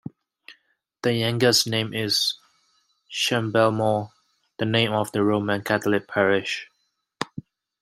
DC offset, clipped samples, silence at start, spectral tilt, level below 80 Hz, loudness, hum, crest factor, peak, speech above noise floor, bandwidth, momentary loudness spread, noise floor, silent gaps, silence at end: under 0.1%; under 0.1%; 0.5 s; -4 dB/octave; -66 dBFS; -23 LUFS; none; 20 dB; -4 dBFS; 45 dB; 16 kHz; 14 LU; -67 dBFS; none; 0.4 s